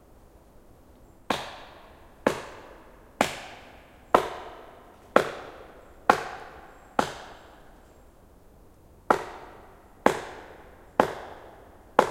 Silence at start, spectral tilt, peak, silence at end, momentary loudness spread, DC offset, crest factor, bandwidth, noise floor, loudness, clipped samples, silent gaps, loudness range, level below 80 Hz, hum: 1.3 s; -4 dB/octave; 0 dBFS; 0 s; 25 LU; under 0.1%; 32 dB; 16.5 kHz; -53 dBFS; -28 LUFS; under 0.1%; none; 5 LU; -56 dBFS; none